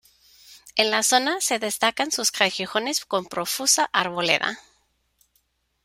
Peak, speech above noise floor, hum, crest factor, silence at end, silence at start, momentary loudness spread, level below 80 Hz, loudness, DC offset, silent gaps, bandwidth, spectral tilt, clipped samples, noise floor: -2 dBFS; 46 dB; none; 22 dB; 1.25 s; 0.5 s; 8 LU; -68 dBFS; -22 LUFS; under 0.1%; none; 16.5 kHz; -1 dB/octave; under 0.1%; -69 dBFS